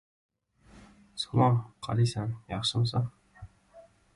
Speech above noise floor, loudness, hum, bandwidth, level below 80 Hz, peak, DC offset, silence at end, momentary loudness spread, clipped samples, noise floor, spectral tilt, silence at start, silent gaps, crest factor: 30 dB; -29 LUFS; none; 11.5 kHz; -58 dBFS; -12 dBFS; under 0.1%; 0.35 s; 12 LU; under 0.1%; -58 dBFS; -6 dB/octave; 0.75 s; none; 20 dB